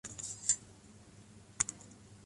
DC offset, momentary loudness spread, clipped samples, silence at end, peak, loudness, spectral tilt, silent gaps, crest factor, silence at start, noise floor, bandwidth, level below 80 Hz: under 0.1%; 24 LU; under 0.1%; 0 s; -12 dBFS; -35 LUFS; -0.5 dB/octave; none; 30 dB; 0.05 s; -57 dBFS; 11.5 kHz; -66 dBFS